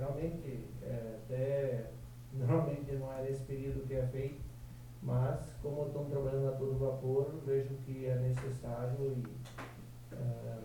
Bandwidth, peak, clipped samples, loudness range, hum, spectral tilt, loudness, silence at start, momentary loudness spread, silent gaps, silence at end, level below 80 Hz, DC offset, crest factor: 18.5 kHz; -20 dBFS; under 0.1%; 2 LU; none; -8.5 dB/octave; -38 LUFS; 0 s; 13 LU; none; 0 s; -54 dBFS; under 0.1%; 18 dB